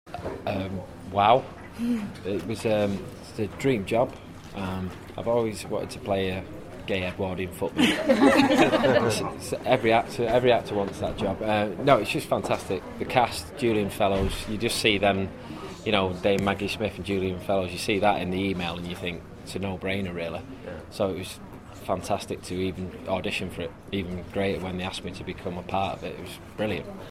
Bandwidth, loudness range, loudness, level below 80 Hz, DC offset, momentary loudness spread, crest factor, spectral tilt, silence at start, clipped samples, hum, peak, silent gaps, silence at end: 16 kHz; 9 LU; -26 LUFS; -48 dBFS; under 0.1%; 14 LU; 24 dB; -5 dB/octave; 0.05 s; under 0.1%; none; -4 dBFS; none; 0 s